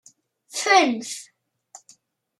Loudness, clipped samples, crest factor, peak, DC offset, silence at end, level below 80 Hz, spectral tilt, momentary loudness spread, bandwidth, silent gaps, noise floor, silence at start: -20 LUFS; under 0.1%; 22 dB; -4 dBFS; under 0.1%; 1.15 s; -84 dBFS; -1 dB/octave; 17 LU; 13.5 kHz; none; -57 dBFS; 0.55 s